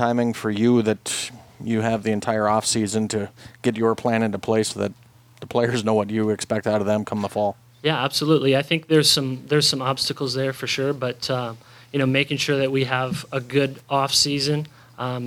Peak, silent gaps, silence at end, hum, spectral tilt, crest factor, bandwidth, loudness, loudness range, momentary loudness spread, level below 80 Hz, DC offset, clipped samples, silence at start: -4 dBFS; none; 0 s; none; -4.5 dB/octave; 18 dB; 17 kHz; -22 LUFS; 3 LU; 9 LU; -60 dBFS; under 0.1%; under 0.1%; 0 s